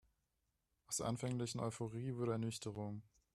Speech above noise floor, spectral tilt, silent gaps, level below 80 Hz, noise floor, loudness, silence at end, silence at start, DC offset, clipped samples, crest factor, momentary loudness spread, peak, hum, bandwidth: 44 dB; -5.5 dB/octave; none; -72 dBFS; -86 dBFS; -43 LUFS; 0.35 s; 0.9 s; under 0.1%; under 0.1%; 18 dB; 7 LU; -28 dBFS; none; 13.5 kHz